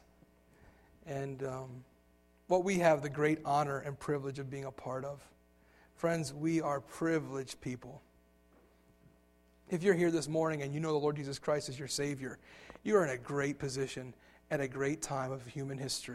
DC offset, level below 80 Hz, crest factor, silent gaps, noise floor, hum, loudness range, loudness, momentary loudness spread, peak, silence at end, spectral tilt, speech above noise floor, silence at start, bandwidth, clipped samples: under 0.1%; -66 dBFS; 22 dB; none; -67 dBFS; none; 4 LU; -35 LUFS; 14 LU; -14 dBFS; 0 s; -5.5 dB/octave; 32 dB; 0.65 s; 15 kHz; under 0.1%